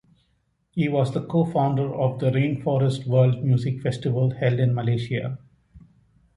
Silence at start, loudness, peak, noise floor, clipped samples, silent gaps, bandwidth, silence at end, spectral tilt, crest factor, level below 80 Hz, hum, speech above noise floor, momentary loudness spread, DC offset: 0.75 s; -23 LUFS; -8 dBFS; -69 dBFS; under 0.1%; none; 10.5 kHz; 0.55 s; -8.5 dB/octave; 16 dB; -56 dBFS; none; 47 dB; 7 LU; under 0.1%